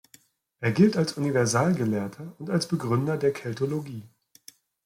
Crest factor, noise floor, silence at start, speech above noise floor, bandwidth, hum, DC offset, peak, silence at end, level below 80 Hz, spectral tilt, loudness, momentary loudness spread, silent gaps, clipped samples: 18 dB; -59 dBFS; 0.6 s; 34 dB; 16.5 kHz; none; under 0.1%; -8 dBFS; 0.8 s; -64 dBFS; -6 dB/octave; -26 LUFS; 13 LU; none; under 0.1%